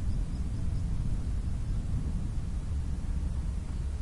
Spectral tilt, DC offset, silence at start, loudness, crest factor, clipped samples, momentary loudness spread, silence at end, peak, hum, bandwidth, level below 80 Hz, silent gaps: -7.5 dB/octave; under 0.1%; 0 s; -35 LUFS; 10 dB; under 0.1%; 2 LU; 0 s; -20 dBFS; none; 11.5 kHz; -32 dBFS; none